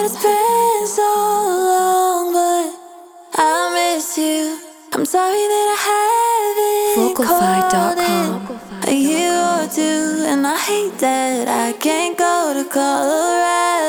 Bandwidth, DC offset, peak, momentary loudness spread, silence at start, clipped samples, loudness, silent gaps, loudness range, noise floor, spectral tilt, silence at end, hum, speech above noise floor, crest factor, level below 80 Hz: over 20 kHz; 0.1%; -2 dBFS; 5 LU; 0 s; under 0.1%; -16 LUFS; none; 2 LU; -39 dBFS; -3 dB/octave; 0 s; none; 23 dB; 14 dB; -60 dBFS